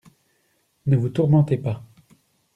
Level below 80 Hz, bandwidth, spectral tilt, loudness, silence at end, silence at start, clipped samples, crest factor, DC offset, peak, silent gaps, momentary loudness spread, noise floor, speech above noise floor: -58 dBFS; 4.2 kHz; -10 dB/octave; -21 LUFS; 0.7 s; 0.85 s; under 0.1%; 16 dB; under 0.1%; -6 dBFS; none; 12 LU; -67 dBFS; 48 dB